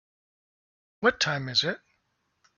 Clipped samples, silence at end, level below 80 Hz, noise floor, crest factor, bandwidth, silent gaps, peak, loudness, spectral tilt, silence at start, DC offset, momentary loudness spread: under 0.1%; 0.8 s; -66 dBFS; -75 dBFS; 22 dB; 7.2 kHz; none; -10 dBFS; -26 LUFS; -1.5 dB/octave; 1 s; under 0.1%; 8 LU